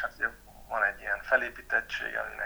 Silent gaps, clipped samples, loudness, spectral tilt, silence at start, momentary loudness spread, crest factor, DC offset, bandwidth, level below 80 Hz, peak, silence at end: none; under 0.1%; -30 LUFS; -3 dB/octave; 0 s; 7 LU; 22 dB; under 0.1%; over 20 kHz; -56 dBFS; -10 dBFS; 0 s